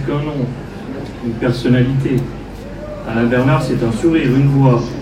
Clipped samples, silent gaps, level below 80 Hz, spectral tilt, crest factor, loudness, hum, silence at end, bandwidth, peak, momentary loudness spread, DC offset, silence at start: under 0.1%; none; -34 dBFS; -8 dB/octave; 16 dB; -15 LUFS; none; 0 s; 11 kHz; 0 dBFS; 15 LU; under 0.1%; 0 s